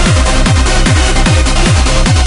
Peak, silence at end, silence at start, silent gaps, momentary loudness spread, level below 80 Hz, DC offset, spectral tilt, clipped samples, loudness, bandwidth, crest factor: 0 dBFS; 0 s; 0 s; none; 0 LU; -10 dBFS; under 0.1%; -4.5 dB/octave; under 0.1%; -10 LUFS; 11 kHz; 8 dB